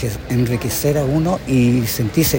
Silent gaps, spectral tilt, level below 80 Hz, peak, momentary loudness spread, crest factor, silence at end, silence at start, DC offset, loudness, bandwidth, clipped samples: none; -5.5 dB/octave; -36 dBFS; -2 dBFS; 4 LU; 14 dB; 0 s; 0 s; under 0.1%; -17 LUFS; 16.5 kHz; under 0.1%